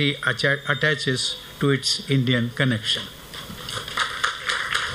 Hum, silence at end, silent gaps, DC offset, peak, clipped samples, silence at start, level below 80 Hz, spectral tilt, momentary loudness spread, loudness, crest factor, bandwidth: none; 0 s; none; under 0.1%; -6 dBFS; under 0.1%; 0 s; -52 dBFS; -4 dB/octave; 10 LU; -23 LUFS; 18 dB; 16 kHz